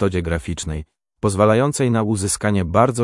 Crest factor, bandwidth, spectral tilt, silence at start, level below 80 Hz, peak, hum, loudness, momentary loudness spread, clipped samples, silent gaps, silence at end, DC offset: 18 dB; 12 kHz; -5.5 dB/octave; 0 s; -40 dBFS; 0 dBFS; none; -19 LUFS; 11 LU; under 0.1%; none; 0 s; under 0.1%